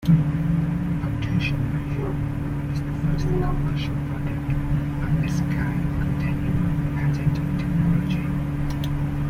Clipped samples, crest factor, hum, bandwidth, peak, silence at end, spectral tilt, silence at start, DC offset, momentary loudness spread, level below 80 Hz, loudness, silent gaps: under 0.1%; 16 dB; none; 14.5 kHz; -8 dBFS; 0 s; -8 dB/octave; 0 s; under 0.1%; 5 LU; -32 dBFS; -24 LUFS; none